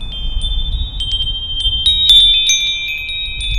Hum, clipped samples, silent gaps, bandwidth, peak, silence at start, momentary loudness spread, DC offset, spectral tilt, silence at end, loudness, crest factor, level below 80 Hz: none; under 0.1%; none; 16.5 kHz; 0 dBFS; 0 s; 15 LU; under 0.1%; 0 dB/octave; 0 s; -12 LUFS; 14 dB; -22 dBFS